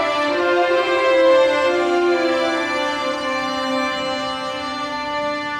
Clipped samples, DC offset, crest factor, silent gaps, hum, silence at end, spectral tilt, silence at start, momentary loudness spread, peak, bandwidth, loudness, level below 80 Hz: under 0.1%; under 0.1%; 14 dB; none; none; 0 s; -3.5 dB/octave; 0 s; 9 LU; -4 dBFS; 11 kHz; -19 LUFS; -54 dBFS